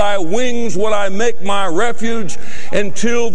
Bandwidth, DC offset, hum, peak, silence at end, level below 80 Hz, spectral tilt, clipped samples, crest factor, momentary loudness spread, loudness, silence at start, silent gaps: 11 kHz; 40%; none; 0 dBFS; 0 s; -44 dBFS; -4 dB/octave; under 0.1%; 12 dB; 5 LU; -19 LUFS; 0 s; none